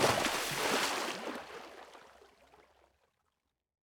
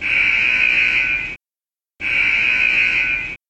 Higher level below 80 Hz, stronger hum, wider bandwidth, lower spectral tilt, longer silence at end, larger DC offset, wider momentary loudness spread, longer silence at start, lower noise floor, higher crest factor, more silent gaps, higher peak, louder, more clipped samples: second, -68 dBFS vs -44 dBFS; neither; first, over 20 kHz vs 8.8 kHz; about the same, -2 dB/octave vs -2 dB/octave; first, 1.9 s vs 0.15 s; neither; first, 20 LU vs 10 LU; about the same, 0 s vs 0 s; second, -84 dBFS vs under -90 dBFS; first, 24 dB vs 14 dB; neither; second, -14 dBFS vs -4 dBFS; second, -33 LUFS vs -14 LUFS; neither